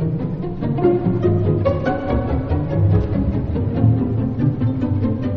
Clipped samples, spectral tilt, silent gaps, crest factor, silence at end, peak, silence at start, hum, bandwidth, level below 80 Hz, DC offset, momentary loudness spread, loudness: under 0.1%; -9.5 dB/octave; none; 16 dB; 0 s; -2 dBFS; 0 s; none; 4.9 kHz; -32 dBFS; under 0.1%; 4 LU; -19 LUFS